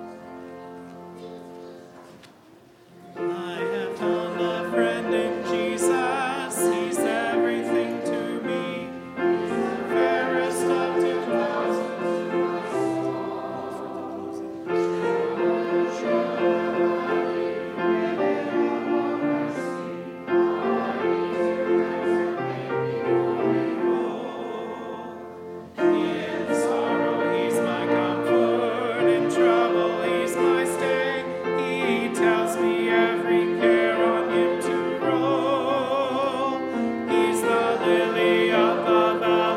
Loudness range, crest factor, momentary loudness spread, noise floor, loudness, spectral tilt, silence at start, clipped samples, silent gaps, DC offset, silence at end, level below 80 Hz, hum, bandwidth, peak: 5 LU; 16 dB; 12 LU; -52 dBFS; -24 LUFS; -5 dB/octave; 0 s; under 0.1%; none; under 0.1%; 0 s; -68 dBFS; none; 15 kHz; -6 dBFS